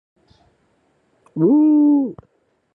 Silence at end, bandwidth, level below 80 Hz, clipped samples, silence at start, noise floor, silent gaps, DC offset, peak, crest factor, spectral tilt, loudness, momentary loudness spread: 0.65 s; 1.5 kHz; -66 dBFS; under 0.1%; 1.35 s; -63 dBFS; none; under 0.1%; -6 dBFS; 14 dB; -12.5 dB/octave; -16 LUFS; 14 LU